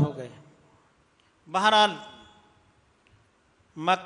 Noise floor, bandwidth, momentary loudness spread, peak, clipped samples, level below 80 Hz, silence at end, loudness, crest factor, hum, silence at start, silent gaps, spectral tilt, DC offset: -64 dBFS; 10.5 kHz; 26 LU; -8 dBFS; under 0.1%; -72 dBFS; 0 s; -23 LUFS; 22 dB; none; 0 s; none; -4.5 dB/octave; under 0.1%